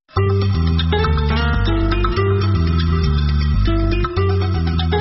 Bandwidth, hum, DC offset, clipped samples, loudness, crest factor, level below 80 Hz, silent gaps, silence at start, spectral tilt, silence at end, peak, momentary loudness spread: 6 kHz; none; under 0.1%; under 0.1%; -18 LUFS; 10 dB; -20 dBFS; none; 0.15 s; -6 dB/octave; 0 s; -6 dBFS; 1 LU